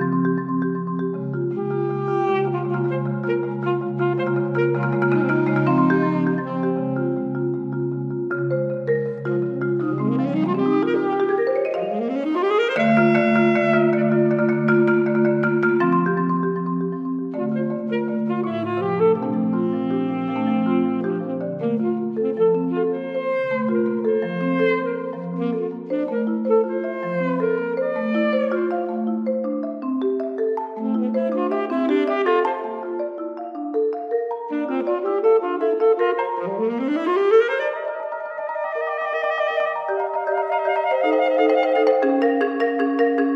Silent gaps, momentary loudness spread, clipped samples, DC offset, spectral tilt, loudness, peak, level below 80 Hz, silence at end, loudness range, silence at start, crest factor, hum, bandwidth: none; 8 LU; under 0.1%; under 0.1%; -9 dB/octave; -21 LUFS; -6 dBFS; -78 dBFS; 0 s; 5 LU; 0 s; 16 dB; none; 6.4 kHz